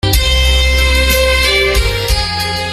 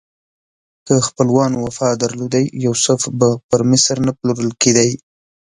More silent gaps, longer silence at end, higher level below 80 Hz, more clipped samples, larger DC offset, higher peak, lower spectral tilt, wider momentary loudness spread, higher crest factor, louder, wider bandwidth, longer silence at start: second, none vs 3.44-3.49 s; second, 0 s vs 0.5 s; first, -16 dBFS vs -52 dBFS; neither; neither; about the same, 0 dBFS vs 0 dBFS; second, -3 dB/octave vs -4.5 dB/octave; about the same, 5 LU vs 6 LU; about the same, 12 dB vs 16 dB; first, -11 LUFS vs -16 LUFS; first, 16 kHz vs 11.5 kHz; second, 0.05 s vs 0.85 s